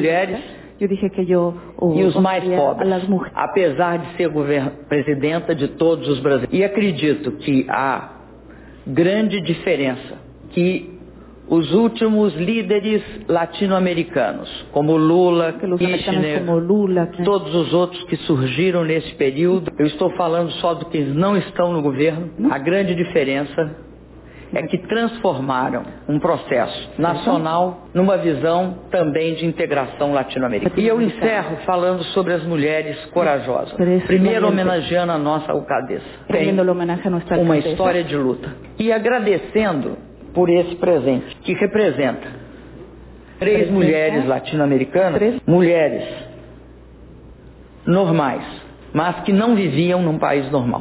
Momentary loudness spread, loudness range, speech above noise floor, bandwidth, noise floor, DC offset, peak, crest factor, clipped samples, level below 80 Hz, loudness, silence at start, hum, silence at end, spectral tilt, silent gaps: 8 LU; 3 LU; 24 dB; 4 kHz; -42 dBFS; under 0.1%; -4 dBFS; 14 dB; under 0.1%; -48 dBFS; -19 LUFS; 0 s; none; 0 s; -11 dB/octave; none